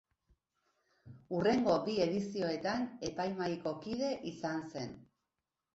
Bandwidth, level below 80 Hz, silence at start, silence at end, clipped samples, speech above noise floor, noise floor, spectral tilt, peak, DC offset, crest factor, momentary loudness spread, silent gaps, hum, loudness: 8 kHz; -68 dBFS; 1.05 s; 0.7 s; under 0.1%; 54 dB; -89 dBFS; -5 dB/octave; -18 dBFS; under 0.1%; 20 dB; 10 LU; none; none; -36 LUFS